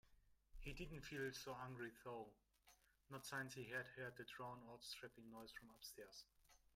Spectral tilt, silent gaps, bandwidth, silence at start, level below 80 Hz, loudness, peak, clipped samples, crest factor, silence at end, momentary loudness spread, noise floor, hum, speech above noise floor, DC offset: -4 dB/octave; none; 16 kHz; 0.05 s; -68 dBFS; -54 LUFS; -36 dBFS; under 0.1%; 20 dB; 0.1 s; 10 LU; -76 dBFS; none; 22 dB; under 0.1%